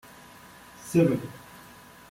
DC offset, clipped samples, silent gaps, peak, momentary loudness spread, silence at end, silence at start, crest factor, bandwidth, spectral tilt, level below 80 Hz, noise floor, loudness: under 0.1%; under 0.1%; none; -10 dBFS; 25 LU; 0.75 s; 0.8 s; 20 dB; 16.5 kHz; -7 dB/octave; -62 dBFS; -50 dBFS; -25 LUFS